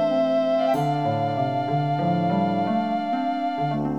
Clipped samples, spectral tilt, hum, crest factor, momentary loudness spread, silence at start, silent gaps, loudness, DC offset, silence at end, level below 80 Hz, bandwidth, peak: under 0.1%; -8 dB/octave; none; 12 dB; 4 LU; 0 s; none; -23 LUFS; 0.2%; 0 s; -62 dBFS; 14 kHz; -10 dBFS